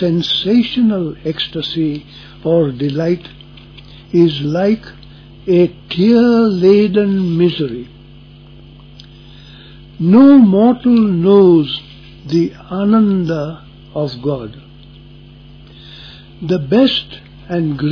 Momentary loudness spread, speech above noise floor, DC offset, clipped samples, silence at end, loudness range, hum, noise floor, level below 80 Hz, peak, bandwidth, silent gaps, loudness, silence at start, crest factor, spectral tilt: 17 LU; 26 dB; under 0.1%; under 0.1%; 0 s; 8 LU; none; -39 dBFS; -44 dBFS; 0 dBFS; 5.4 kHz; none; -13 LUFS; 0 s; 14 dB; -8.5 dB/octave